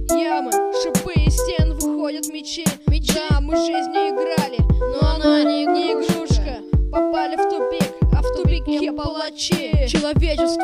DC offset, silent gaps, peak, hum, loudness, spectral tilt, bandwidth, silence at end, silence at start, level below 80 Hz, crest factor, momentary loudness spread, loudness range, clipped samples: under 0.1%; none; -4 dBFS; none; -20 LUFS; -5.5 dB/octave; 15.5 kHz; 0 s; 0 s; -24 dBFS; 14 dB; 4 LU; 2 LU; under 0.1%